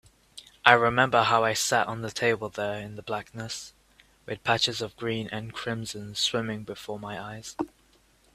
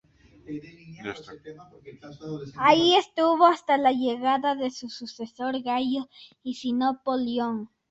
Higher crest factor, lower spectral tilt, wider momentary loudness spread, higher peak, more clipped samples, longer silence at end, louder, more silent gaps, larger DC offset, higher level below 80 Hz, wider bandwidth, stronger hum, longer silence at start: first, 28 dB vs 20 dB; second, -3 dB/octave vs -4.5 dB/octave; second, 16 LU vs 20 LU; first, 0 dBFS vs -6 dBFS; neither; first, 0.65 s vs 0.25 s; second, -27 LUFS vs -24 LUFS; neither; neither; first, -60 dBFS vs -66 dBFS; first, 15.5 kHz vs 8 kHz; neither; second, 0.35 s vs 0.5 s